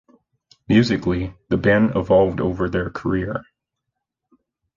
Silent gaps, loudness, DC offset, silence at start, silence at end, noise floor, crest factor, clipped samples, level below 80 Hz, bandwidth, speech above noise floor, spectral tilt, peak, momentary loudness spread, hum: none; -20 LUFS; under 0.1%; 0.7 s; 1.35 s; -80 dBFS; 18 dB; under 0.1%; -42 dBFS; 7.4 kHz; 61 dB; -7.5 dB/octave; -4 dBFS; 8 LU; none